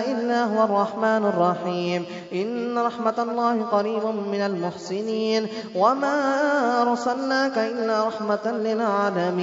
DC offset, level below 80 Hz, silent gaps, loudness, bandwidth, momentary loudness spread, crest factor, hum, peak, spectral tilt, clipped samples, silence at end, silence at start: under 0.1%; -74 dBFS; none; -23 LUFS; 7.8 kHz; 6 LU; 16 dB; none; -6 dBFS; -5.5 dB/octave; under 0.1%; 0 s; 0 s